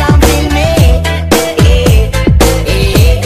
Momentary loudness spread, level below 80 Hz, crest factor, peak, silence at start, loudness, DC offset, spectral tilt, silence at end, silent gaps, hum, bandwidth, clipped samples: 3 LU; -12 dBFS; 8 dB; 0 dBFS; 0 s; -9 LUFS; under 0.1%; -5.5 dB/octave; 0 s; none; none; 15.5 kHz; 0.2%